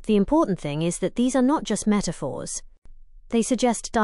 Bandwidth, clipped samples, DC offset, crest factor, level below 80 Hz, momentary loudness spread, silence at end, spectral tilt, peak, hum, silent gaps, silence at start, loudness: 11.5 kHz; under 0.1%; under 0.1%; 16 dB; -44 dBFS; 10 LU; 0 s; -5 dB/octave; -8 dBFS; none; 2.78-2.82 s; 0 s; -24 LUFS